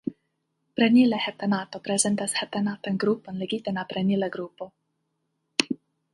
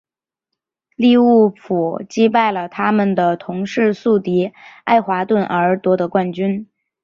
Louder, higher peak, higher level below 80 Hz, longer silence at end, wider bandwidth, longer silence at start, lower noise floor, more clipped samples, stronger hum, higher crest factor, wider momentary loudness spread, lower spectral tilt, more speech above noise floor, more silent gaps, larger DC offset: second, -25 LUFS vs -16 LUFS; about the same, 0 dBFS vs -2 dBFS; second, -70 dBFS vs -60 dBFS; about the same, 0.4 s vs 0.4 s; first, 11.5 kHz vs 7.2 kHz; second, 0.05 s vs 1 s; second, -77 dBFS vs -81 dBFS; neither; neither; first, 26 dB vs 16 dB; first, 16 LU vs 9 LU; second, -4 dB/octave vs -7 dB/octave; second, 52 dB vs 65 dB; neither; neither